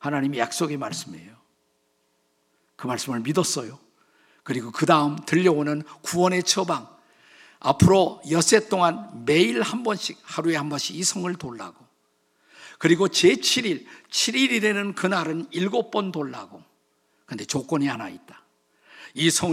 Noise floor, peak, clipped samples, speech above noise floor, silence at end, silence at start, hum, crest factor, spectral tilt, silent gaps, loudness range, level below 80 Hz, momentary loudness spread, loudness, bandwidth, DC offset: -69 dBFS; -2 dBFS; under 0.1%; 46 dB; 0 s; 0 s; none; 22 dB; -4 dB/octave; none; 9 LU; -60 dBFS; 14 LU; -23 LUFS; 16 kHz; under 0.1%